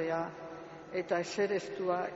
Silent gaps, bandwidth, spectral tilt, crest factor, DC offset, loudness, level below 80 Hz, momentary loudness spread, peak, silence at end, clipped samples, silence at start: none; 8 kHz; -4 dB/octave; 16 dB; under 0.1%; -35 LUFS; -74 dBFS; 13 LU; -18 dBFS; 0 s; under 0.1%; 0 s